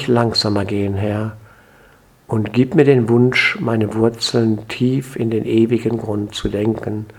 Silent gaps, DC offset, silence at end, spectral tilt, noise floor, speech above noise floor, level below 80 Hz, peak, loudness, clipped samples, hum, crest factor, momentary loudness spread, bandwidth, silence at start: none; under 0.1%; 0.05 s; -6 dB/octave; -49 dBFS; 33 dB; -46 dBFS; 0 dBFS; -17 LUFS; under 0.1%; none; 18 dB; 9 LU; 15 kHz; 0 s